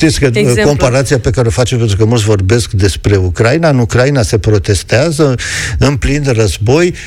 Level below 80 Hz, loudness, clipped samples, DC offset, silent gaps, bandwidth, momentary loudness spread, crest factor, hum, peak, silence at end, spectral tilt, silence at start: -24 dBFS; -11 LUFS; under 0.1%; under 0.1%; none; 15 kHz; 3 LU; 10 dB; none; 0 dBFS; 0 s; -5.5 dB/octave; 0 s